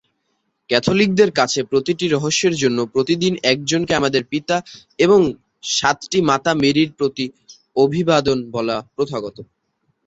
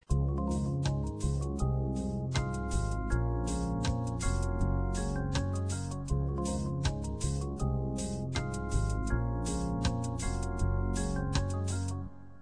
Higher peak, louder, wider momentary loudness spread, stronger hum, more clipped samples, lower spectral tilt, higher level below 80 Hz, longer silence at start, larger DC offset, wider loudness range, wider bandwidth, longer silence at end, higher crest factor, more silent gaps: first, -2 dBFS vs -16 dBFS; first, -18 LUFS vs -34 LUFS; first, 9 LU vs 3 LU; neither; neither; second, -4.5 dB/octave vs -6 dB/octave; second, -52 dBFS vs -36 dBFS; first, 0.7 s vs 0 s; second, under 0.1% vs 0.3%; about the same, 2 LU vs 1 LU; second, 8 kHz vs 10.5 kHz; first, 0.6 s vs 0.05 s; about the same, 18 dB vs 14 dB; neither